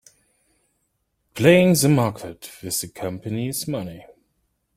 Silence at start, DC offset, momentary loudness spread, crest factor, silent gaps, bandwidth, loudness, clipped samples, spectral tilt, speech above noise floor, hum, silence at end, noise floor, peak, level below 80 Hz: 1.35 s; under 0.1%; 21 LU; 20 dB; none; 16.5 kHz; -20 LUFS; under 0.1%; -5 dB/octave; 52 dB; none; 0.75 s; -72 dBFS; -2 dBFS; -56 dBFS